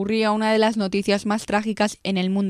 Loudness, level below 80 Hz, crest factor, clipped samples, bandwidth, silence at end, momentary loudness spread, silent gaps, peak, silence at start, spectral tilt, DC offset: -22 LUFS; -56 dBFS; 14 dB; under 0.1%; 12.5 kHz; 0 s; 4 LU; none; -6 dBFS; 0 s; -5.5 dB/octave; under 0.1%